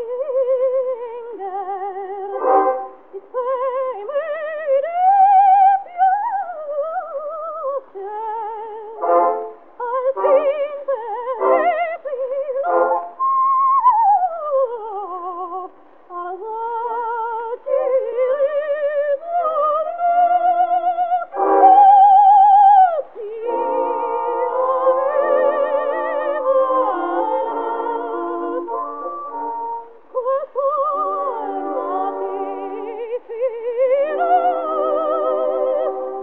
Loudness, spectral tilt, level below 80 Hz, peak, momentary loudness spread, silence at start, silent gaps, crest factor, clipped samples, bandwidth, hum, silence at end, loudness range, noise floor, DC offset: -18 LUFS; -7 dB/octave; -80 dBFS; -2 dBFS; 15 LU; 0 s; none; 16 dB; under 0.1%; 3.8 kHz; none; 0 s; 11 LU; -40 dBFS; 0.4%